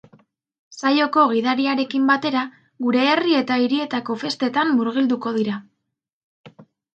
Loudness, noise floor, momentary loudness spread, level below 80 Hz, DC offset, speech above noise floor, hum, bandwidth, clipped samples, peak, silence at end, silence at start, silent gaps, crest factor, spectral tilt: -20 LUFS; -56 dBFS; 8 LU; -74 dBFS; under 0.1%; 37 dB; none; 8.2 kHz; under 0.1%; -4 dBFS; 0.3 s; 0.7 s; 6.13-6.44 s; 18 dB; -5 dB/octave